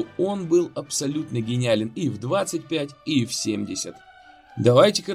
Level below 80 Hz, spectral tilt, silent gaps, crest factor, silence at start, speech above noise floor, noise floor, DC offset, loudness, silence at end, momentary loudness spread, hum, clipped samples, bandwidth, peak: -62 dBFS; -5 dB/octave; none; 20 dB; 0 s; 26 dB; -49 dBFS; under 0.1%; -23 LUFS; 0 s; 11 LU; none; under 0.1%; 15.5 kHz; -4 dBFS